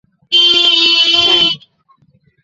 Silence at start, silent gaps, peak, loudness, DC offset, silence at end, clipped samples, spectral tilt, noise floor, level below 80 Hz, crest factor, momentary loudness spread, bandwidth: 0.3 s; none; 0 dBFS; -8 LUFS; under 0.1%; 0.85 s; under 0.1%; -1 dB/octave; -54 dBFS; -54 dBFS; 12 dB; 6 LU; 8 kHz